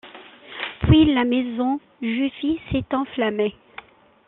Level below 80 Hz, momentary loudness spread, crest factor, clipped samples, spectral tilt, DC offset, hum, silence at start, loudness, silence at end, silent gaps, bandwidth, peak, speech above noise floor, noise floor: -40 dBFS; 24 LU; 20 dB; under 0.1%; -5.5 dB/octave; under 0.1%; none; 0.05 s; -22 LUFS; 0.75 s; none; 4.1 kHz; -2 dBFS; 24 dB; -45 dBFS